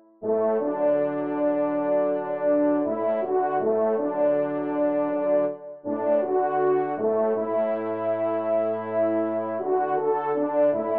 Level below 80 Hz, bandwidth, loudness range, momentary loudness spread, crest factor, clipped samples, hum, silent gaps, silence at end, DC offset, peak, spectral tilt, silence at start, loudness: -80 dBFS; 3.8 kHz; 1 LU; 4 LU; 12 dB; under 0.1%; none; none; 0 s; 0.1%; -12 dBFS; -7 dB/octave; 0.2 s; -24 LUFS